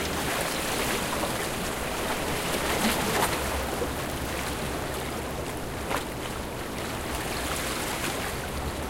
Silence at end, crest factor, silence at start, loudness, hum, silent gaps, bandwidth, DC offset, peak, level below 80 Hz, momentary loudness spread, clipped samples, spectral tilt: 0 s; 18 dB; 0 s; -29 LUFS; none; none; 17 kHz; under 0.1%; -12 dBFS; -40 dBFS; 8 LU; under 0.1%; -3.5 dB/octave